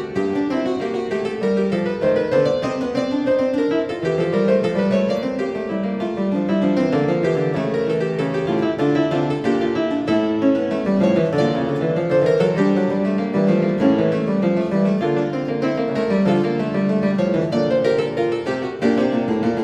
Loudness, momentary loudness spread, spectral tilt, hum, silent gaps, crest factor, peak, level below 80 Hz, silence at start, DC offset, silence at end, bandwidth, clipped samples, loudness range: -19 LUFS; 5 LU; -7.5 dB/octave; none; none; 16 dB; -4 dBFS; -54 dBFS; 0 s; under 0.1%; 0 s; 9.4 kHz; under 0.1%; 2 LU